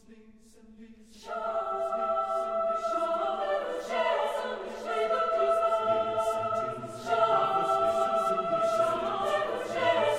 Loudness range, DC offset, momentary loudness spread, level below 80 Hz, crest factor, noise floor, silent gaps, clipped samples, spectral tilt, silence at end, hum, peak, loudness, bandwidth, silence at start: 4 LU; under 0.1%; 7 LU; -64 dBFS; 16 dB; -55 dBFS; none; under 0.1%; -4 dB/octave; 0 s; none; -14 dBFS; -29 LUFS; 13.5 kHz; 0.1 s